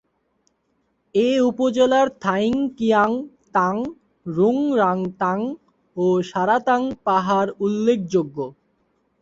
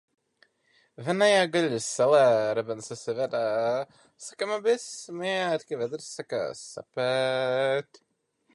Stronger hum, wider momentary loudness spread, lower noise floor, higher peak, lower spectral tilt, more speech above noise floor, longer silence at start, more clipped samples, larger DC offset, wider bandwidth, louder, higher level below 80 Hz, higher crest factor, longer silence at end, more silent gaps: neither; second, 11 LU vs 16 LU; about the same, -69 dBFS vs -67 dBFS; about the same, -6 dBFS vs -8 dBFS; first, -6.5 dB/octave vs -4 dB/octave; first, 49 dB vs 40 dB; first, 1.15 s vs 1 s; neither; neither; second, 8 kHz vs 11.5 kHz; first, -20 LUFS vs -27 LUFS; first, -60 dBFS vs -76 dBFS; about the same, 16 dB vs 18 dB; about the same, 0.7 s vs 0.7 s; neither